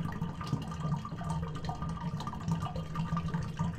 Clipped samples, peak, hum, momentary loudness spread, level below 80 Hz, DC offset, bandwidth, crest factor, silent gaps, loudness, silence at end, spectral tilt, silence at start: under 0.1%; -20 dBFS; none; 3 LU; -48 dBFS; under 0.1%; 9.8 kHz; 16 dB; none; -37 LUFS; 0 s; -7 dB/octave; 0 s